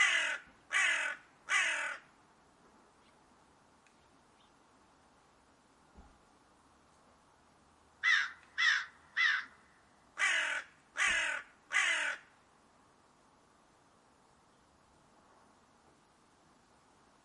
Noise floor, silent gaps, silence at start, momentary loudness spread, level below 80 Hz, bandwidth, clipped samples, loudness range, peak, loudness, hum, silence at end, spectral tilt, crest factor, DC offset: -67 dBFS; none; 0 s; 13 LU; -76 dBFS; 11.5 kHz; under 0.1%; 6 LU; -16 dBFS; -32 LUFS; none; 5.05 s; 1.5 dB/octave; 22 dB; under 0.1%